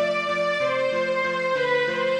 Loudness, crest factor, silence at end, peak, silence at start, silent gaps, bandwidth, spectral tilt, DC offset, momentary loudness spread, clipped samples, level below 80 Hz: -23 LUFS; 12 dB; 0 s; -12 dBFS; 0 s; none; 10 kHz; -4 dB/octave; under 0.1%; 1 LU; under 0.1%; -64 dBFS